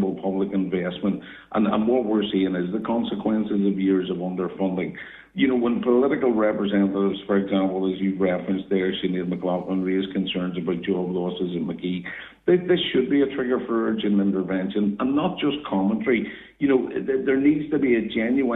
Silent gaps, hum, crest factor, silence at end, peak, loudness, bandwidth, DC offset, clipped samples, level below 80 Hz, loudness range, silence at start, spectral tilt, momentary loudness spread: none; none; 14 dB; 0 s; -8 dBFS; -23 LUFS; 4 kHz; under 0.1%; under 0.1%; -58 dBFS; 3 LU; 0 s; -10 dB/octave; 7 LU